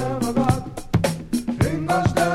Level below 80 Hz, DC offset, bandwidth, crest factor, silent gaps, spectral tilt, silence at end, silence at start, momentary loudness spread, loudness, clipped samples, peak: -38 dBFS; under 0.1%; 16 kHz; 18 dB; none; -6 dB/octave; 0 s; 0 s; 6 LU; -22 LUFS; under 0.1%; -4 dBFS